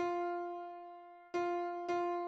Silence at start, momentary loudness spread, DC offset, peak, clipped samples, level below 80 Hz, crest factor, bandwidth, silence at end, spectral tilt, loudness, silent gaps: 0 s; 14 LU; under 0.1%; -26 dBFS; under 0.1%; -84 dBFS; 12 dB; 7.2 kHz; 0 s; -5 dB/octave; -39 LUFS; none